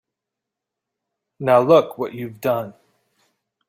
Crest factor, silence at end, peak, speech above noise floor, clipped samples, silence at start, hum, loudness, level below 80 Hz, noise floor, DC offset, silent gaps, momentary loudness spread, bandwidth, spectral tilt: 20 dB; 0.95 s; -2 dBFS; 66 dB; under 0.1%; 1.4 s; none; -19 LUFS; -66 dBFS; -84 dBFS; under 0.1%; none; 15 LU; 16 kHz; -7 dB/octave